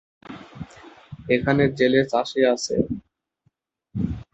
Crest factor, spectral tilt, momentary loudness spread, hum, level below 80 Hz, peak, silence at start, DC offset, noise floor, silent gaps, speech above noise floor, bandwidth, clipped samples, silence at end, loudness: 20 dB; -5.5 dB/octave; 22 LU; none; -48 dBFS; -4 dBFS; 0.3 s; under 0.1%; -69 dBFS; none; 49 dB; 8.2 kHz; under 0.1%; 0.1 s; -22 LUFS